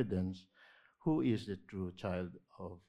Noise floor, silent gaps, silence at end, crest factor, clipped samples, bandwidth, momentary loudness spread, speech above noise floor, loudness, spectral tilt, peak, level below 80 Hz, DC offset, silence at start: -65 dBFS; none; 0.1 s; 18 dB; under 0.1%; 10 kHz; 16 LU; 27 dB; -39 LUFS; -8.5 dB/octave; -22 dBFS; -68 dBFS; under 0.1%; 0 s